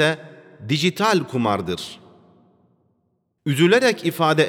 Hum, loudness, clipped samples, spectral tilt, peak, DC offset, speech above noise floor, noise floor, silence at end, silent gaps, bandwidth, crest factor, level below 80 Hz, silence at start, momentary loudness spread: none; -20 LUFS; under 0.1%; -5 dB/octave; -4 dBFS; under 0.1%; 50 dB; -69 dBFS; 0 s; none; 18.5 kHz; 18 dB; -64 dBFS; 0 s; 15 LU